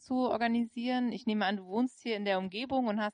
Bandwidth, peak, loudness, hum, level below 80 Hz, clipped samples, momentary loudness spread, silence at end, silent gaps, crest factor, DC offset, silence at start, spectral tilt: 10 kHz; -18 dBFS; -32 LUFS; none; -72 dBFS; under 0.1%; 3 LU; 0.05 s; none; 14 dB; under 0.1%; 0.1 s; -6 dB/octave